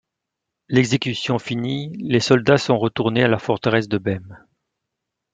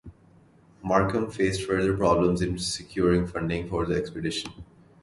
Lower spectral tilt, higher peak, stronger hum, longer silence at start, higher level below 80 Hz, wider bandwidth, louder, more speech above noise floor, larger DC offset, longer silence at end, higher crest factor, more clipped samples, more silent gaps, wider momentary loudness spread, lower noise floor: about the same, -6 dB/octave vs -5.5 dB/octave; first, -2 dBFS vs -6 dBFS; neither; first, 0.7 s vs 0.05 s; second, -56 dBFS vs -44 dBFS; second, 9.2 kHz vs 11.5 kHz; first, -20 LUFS vs -26 LUFS; first, 62 dB vs 31 dB; neither; first, 1 s vs 0.4 s; about the same, 18 dB vs 20 dB; neither; neither; about the same, 9 LU vs 8 LU; first, -82 dBFS vs -56 dBFS